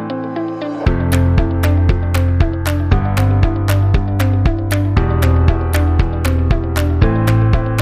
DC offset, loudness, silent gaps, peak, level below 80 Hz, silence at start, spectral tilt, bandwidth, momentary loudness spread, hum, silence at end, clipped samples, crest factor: under 0.1%; -15 LUFS; none; -2 dBFS; -20 dBFS; 0 s; -7 dB/octave; 15.5 kHz; 4 LU; none; 0 s; under 0.1%; 12 dB